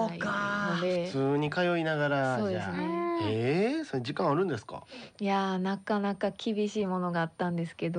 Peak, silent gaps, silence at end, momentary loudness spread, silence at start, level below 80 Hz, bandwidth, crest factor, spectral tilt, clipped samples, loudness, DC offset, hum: -16 dBFS; none; 0 s; 5 LU; 0 s; -70 dBFS; 10 kHz; 14 dB; -6.5 dB/octave; under 0.1%; -30 LUFS; under 0.1%; none